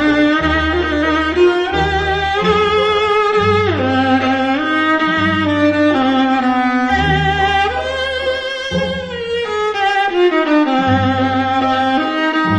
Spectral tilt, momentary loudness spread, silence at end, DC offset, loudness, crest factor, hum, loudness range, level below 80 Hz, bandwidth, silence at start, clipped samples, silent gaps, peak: -6 dB/octave; 5 LU; 0 s; under 0.1%; -14 LUFS; 12 dB; none; 3 LU; -34 dBFS; 9.8 kHz; 0 s; under 0.1%; none; -2 dBFS